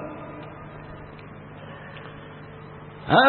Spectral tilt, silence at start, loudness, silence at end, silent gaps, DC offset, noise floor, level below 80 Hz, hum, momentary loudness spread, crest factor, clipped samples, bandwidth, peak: -9.5 dB/octave; 0 s; -35 LUFS; 0 s; none; under 0.1%; -42 dBFS; -54 dBFS; none; 4 LU; 24 dB; under 0.1%; 4.4 kHz; -4 dBFS